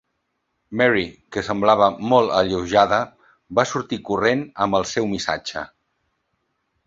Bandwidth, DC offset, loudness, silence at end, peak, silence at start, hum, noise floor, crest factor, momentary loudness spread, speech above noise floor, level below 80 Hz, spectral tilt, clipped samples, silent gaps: 7.8 kHz; under 0.1%; -20 LUFS; 1.2 s; -2 dBFS; 0.7 s; none; -74 dBFS; 20 dB; 12 LU; 54 dB; -52 dBFS; -4.5 dB/octave; under 0.1%; none